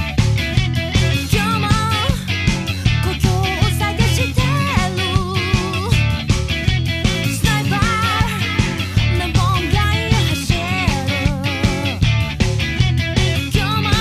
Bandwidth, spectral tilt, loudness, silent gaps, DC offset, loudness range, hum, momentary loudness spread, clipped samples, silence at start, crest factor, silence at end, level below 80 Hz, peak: 15.5 kHz; -5 dB/octave; -17 LUFS; none; under 0.1%; 1 LU; none; 2 LU; under 0.1%; 0 s; 16 dB; 0 s; -26 dBFS; 0 dBFS